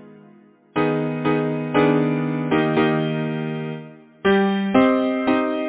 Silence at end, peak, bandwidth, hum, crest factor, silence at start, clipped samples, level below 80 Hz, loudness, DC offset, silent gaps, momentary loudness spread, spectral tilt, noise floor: 0 s; -2 dBFS; 4 kHz; none; 18 dB; 0 s; under 0.1%; -56 dBFS; -20 LUFS; under 0.1%; none; 9 LU; -11 dB/octave; -50 dBFS